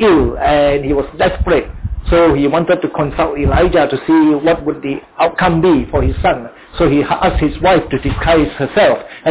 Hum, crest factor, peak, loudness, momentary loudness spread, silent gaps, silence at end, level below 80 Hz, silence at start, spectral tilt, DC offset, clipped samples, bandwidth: none; 10 dB; -2 dBFS; -13 LUFS; 6 LU; none; 0 s; -24 dBFS; 0 s; -10.5 dB/octave; under 0.1%; under 0.1%; 4 kHz